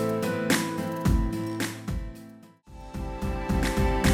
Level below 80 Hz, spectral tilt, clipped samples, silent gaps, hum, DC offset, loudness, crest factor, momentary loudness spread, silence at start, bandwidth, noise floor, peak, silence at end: -32 dBFS; -5.5 dB/octave; under 0.1%; none; none; under 0.1%; -28 LUFS; 16 dB; 16 LU; 0 s; 16.5 kHz; -49 dBFS; -10 dBFS; 0 s